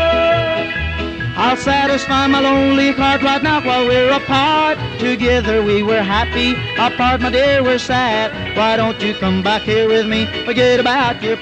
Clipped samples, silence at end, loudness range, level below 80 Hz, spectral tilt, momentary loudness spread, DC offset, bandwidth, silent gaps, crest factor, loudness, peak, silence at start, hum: under 0.1%; 0 s; 2 LU; -34 dBFS; -5 dB/octave; 5 LU; under 0.1%; 9.2 kHz; none; 14 dB; -15 LUFS; -2 dBFS; 0 s; none